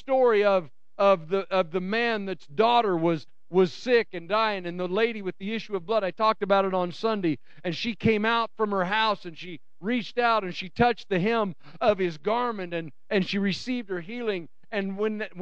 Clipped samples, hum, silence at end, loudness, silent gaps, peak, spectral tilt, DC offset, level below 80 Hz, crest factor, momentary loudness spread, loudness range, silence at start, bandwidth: under 0.1%; none; 0 s; -26 LUFS; none; -8 dBFS; -6.5 dB/octave; 0.8%; -62 dBFS; 18 dB; 11 LU; 3 LU; 0.1 s; 8.2 kHz